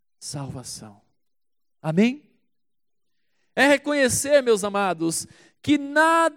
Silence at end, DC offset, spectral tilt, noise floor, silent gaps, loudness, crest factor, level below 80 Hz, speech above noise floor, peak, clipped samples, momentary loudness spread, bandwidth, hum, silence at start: 0.05 s; under 0.1%; -4 dB/octave; -87 dBFS; none; -21 LUFS; 18 dB; -62 dBFS; 66 dB; -6 dBFS; under 0.1%; 17 LU; 17 kHz; none; 0.2 s